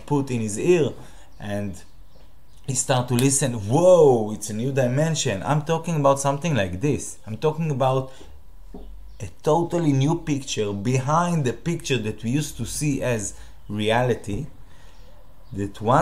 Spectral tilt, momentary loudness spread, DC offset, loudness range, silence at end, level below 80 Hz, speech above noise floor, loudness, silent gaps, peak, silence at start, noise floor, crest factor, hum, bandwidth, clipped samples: -5.5 dB/octave; 13 LU; 1%; 6 LU; 0 s; -46 dBFS; 29 dB; -22 LUFS; none; -4 dBFS; 0 s; -51 dBFS; 18 dB; none; 15.5 kHz; under 0.1%